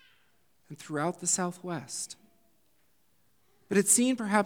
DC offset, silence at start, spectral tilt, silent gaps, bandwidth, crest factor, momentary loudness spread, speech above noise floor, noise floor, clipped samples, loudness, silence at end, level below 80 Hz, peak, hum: under 0.1%; 0.7 s; -3.5 dB/octave; none; over 20 kHz; 22 dB; 17 LU; 43 dB; -72 dBFS; under 0.1%; -28 LUFS; 0 s; -82 dBFS; -10 dBFS; none